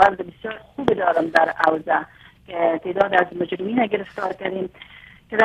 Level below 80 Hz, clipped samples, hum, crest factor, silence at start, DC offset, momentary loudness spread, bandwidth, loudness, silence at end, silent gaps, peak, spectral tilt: -54 dBFS; under 0.1%; none; 20 dB; 0 s; under 0.1%; 15 LU; 11 kHz; -21 LUFS; 0 s; none; -2 dBFS; -6 dB/octave